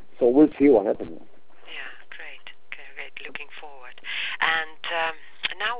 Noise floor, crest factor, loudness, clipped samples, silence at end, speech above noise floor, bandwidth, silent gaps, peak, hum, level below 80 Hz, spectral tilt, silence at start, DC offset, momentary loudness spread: -45 dBFS; 20 dB; -22 LUFS; under 0.1%; 0 s; 25 dB; 4 kHz; none; -6 dBFS; none; -62 dBFS; -8 dB/octave; 0.2 s; 2%; 22 LU